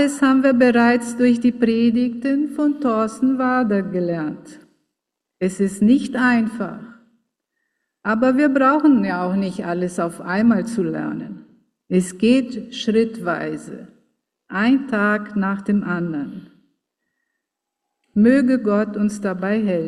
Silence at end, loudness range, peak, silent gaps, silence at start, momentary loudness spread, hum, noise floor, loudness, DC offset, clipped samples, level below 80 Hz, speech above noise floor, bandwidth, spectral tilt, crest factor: 0 s; 4 LU; -4 dBFS; none; 0 s; 13 LU; none; -81 dBFS; -19 LUFS; under 0.1%; under 0.1%; -60 dBFS; 63 dB; 12 kHz; -6.5 dB/octave; 16 dB